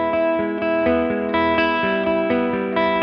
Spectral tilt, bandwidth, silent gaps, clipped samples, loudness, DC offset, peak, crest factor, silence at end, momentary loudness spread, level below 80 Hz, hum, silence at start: -8 dB/octave; 6 kHz; none; under 0.1%; -19 LUFS; under 0.1%; -4 dBFS; 14 dB; 0 s; 3 LU; -48 dBFS; none; 0 s